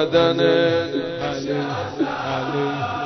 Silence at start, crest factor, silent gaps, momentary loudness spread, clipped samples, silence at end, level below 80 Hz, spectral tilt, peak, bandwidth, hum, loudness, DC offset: 0 s; 16 dB; none; 9 LU; under 0.1%; 0 s; -52 dBFS; -6 dB/octave; -4 dBFS; 6.4 kHz; none; -21 LUFS; under 0.1%